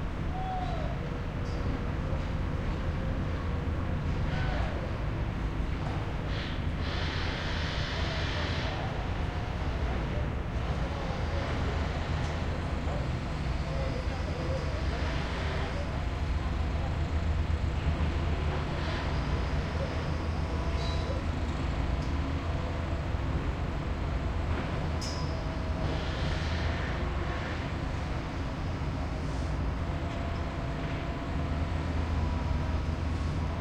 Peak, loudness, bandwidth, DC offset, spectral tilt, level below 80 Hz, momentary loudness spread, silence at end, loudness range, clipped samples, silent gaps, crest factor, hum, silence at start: -18 dBFS; -33 LUFS; 9 kHz; under 0.1%; -6.5 dB/octave; -36 dBFS; 3 LU; 0 s; 2 LU; under 0.1%; none; 14 dB; none; 0 s